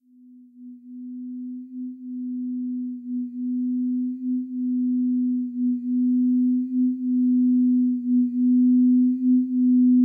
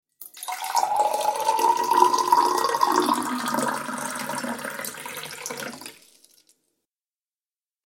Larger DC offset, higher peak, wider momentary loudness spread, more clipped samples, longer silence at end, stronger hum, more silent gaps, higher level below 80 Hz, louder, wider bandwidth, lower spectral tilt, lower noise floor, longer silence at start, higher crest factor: neither; second, -12 dBFS vs -2 dBFS; about the same, 16 LU vs 15 LU; neither; second, 0 s vs 1.9 s; neither; neither; second, under -90 dBFS vs -76 dBFS; about the same, -22 LUFS vs -24 LUFS; second, 0.4 kHz vs 17 kHz; first, -12.5 dB/octave vs -2 dB/octave; second, -50 dBFS vs under -90 dBFS; first, 0.6 s vs 0.2 s; second, 10 dB vs 24 dB